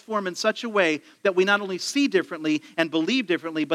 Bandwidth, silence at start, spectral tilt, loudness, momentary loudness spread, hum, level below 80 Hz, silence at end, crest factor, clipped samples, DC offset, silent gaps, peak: 14.5 kHz; 0.1 s; -4 dB/octave; -24 LUFS; 5 LU; none; -82 dBFS; 0 s; 20 dB; under 0.1%; under 0.1%; none; -4 dBFS